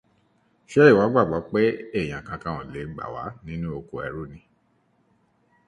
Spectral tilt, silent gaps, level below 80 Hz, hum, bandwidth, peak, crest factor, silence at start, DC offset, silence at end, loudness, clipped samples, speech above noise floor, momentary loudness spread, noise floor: -7.5 dB/octave; none; -52 dBFS; none; 9 kHz; -2 dBFS; 22 dB; 0.7 s; under 0.1%; 1.3 s; -23 LUFS; under 0.1%; 43 dB; 18 LU; -66 dBFS